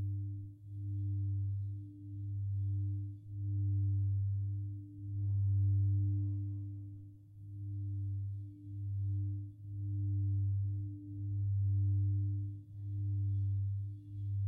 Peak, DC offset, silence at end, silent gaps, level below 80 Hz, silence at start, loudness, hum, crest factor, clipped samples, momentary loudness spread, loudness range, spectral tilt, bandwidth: -26 dBFS; under 0.1%; 0 s; none; -64 dBFS; 0 s; -38 LUFS; none; 10 dB; under 0.1%; 13 LU; 5 LU; -13 dB/octave; 0.6 kHz